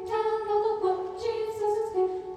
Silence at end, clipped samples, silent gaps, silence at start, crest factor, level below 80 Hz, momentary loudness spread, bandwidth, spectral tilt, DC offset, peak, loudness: 0 s; under 0.1%; none; 0 s; 12 dB; -62 dBFS; 4 LU; 12.5 kHz; -5.5 dB/octave; under 0.1%; -16 dBFS; -28 LUFS